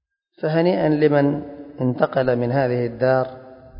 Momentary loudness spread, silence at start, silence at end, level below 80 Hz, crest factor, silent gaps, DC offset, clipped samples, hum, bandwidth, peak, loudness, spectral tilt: 11 LU; 0.4 s; 0 s; -54 dBFS; 18 dB; none; under 0.1%; under 0.1%; none; 5.4 kHz; -4 dBFS; -20 LUFS; -12.5 dB/octave